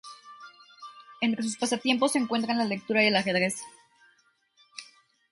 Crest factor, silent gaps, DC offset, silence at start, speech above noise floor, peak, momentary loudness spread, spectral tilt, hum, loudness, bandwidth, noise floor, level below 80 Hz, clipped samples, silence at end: 20 dB; none; under 0.1%; 0.05 s; 40 dB; -10 dBFS; 24 LU; -3.5 dB/octave; none; -26 LUFS; 11.5 kHz; -67 dBFS; -74 dBFS; under 0.1%; 0.5 s